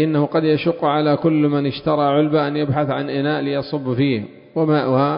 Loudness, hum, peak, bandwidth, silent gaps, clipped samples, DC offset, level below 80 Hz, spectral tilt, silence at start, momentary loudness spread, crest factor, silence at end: -19 LUFS; none; -4 dBFS; 5.4 kHz; none; under 0.1%; under 0.1%; -54 dBFS; -12.5 dB/octave; 0 s; 5 LU; 14 dB; 0 s